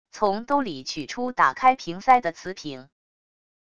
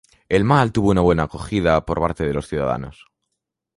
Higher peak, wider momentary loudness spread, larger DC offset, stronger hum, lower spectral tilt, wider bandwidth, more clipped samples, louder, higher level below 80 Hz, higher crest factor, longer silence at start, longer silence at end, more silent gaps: about the same, -4 dBFS vs -2 dBFS; first, 16 LU vs 8 LU; first, 0.4% vs under 0.1%; neither; second, -4 dB/octave vs -7 dB/octave; second, 8.2 kHz vs 11.5 kHz; neither; second, -23 LUFS vs -19 LUFS; second, -60 dBFS vs -36 dBFS; about the same, 20 dB vs 18 dB; second, 0.15 s vs 0.3 s; about the same, 0.8 s vs 0.85 s; neither